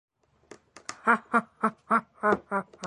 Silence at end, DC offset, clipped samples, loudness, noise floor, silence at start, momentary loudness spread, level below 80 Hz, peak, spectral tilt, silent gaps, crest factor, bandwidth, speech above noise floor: 0 s; under 0.1%; under 0.1%; -27 LUFS; -55 dBFS; 0.9 s; 9 LU; -70 dBFS; -8 dBFS; -5 dB/octave; none; 22 dB; 11.5 kHz; 27 dB